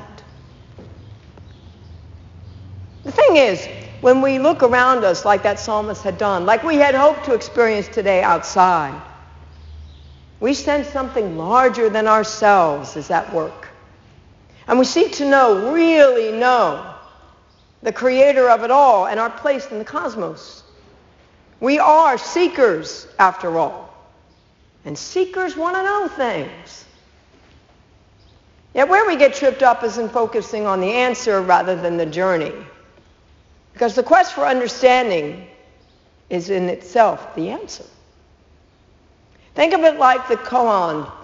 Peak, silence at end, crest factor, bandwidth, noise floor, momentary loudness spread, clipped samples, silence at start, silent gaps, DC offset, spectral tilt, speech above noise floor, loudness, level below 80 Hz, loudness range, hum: 0 dBFS; 0 s; 18 dB; 7.6 kHz; -53 dBFS; 14 LU; under 0.1%; 0 s; none; under 0.1%; -3 dB/octave; 37 dB; -16 LUFS; -50 dBFS; 7 LU; none